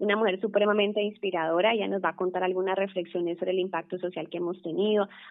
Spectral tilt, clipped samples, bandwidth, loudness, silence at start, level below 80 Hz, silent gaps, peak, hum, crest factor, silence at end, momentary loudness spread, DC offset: -3 dB/octave; under 0.1%; 4 kHz; -28 LUFS; 0 s; -86 dBFS; none; -10 dBFS; none; 16 dB; 0 s; 8 LU; under 0.1%